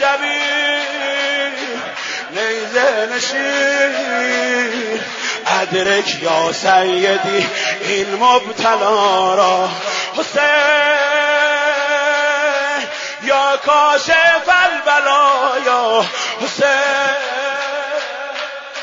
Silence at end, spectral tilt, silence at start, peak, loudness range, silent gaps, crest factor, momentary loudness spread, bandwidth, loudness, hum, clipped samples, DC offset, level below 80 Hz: 0 s; -2 dB/octave; 0 s; 0 dBFS; 4 LU; none; 14 dB; 9 LU; 7.8 kHz; -15 LUFS; none; under 0.1%; under 0.1%; -62 dBFS